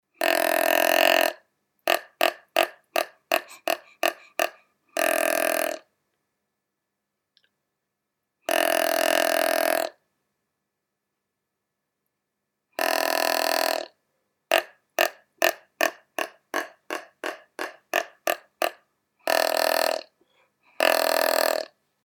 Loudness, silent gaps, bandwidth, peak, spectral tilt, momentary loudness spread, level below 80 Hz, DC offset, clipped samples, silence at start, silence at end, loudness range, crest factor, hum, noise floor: -24 LUFS; none; over 20 kHz; -6 dBFS; 0 dB/octave; 12 LU; -76 dBFS; under 0.1%; under 0.1%; 0.2 s; 0.4 s; 7 LU; 20 dB; none; -82 dBFS